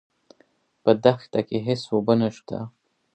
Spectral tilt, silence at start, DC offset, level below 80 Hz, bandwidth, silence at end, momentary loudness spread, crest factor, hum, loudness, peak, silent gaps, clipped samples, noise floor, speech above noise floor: -7.5 dB/octave; 0.85 s; under 0.1%; -64 dBFS; 8.8 kHz; 0.45 s; 15 LU; 22 dB; none; -23 LUFS; -2 dBFS; none; under 0.1%; -63 dBFS; 41 dB